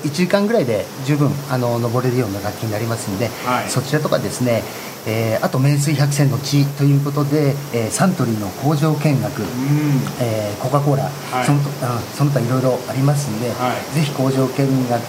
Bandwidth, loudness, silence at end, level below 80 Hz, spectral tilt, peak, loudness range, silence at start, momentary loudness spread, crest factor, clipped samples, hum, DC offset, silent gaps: 16 kHz; -19 LUFS; 0 s; -56 dBFS; -6 dB/octave; 0 dBFS; 3 LU; 0 s; 6 LU; 18 dB; under 0.1%; none; under 0.1%; none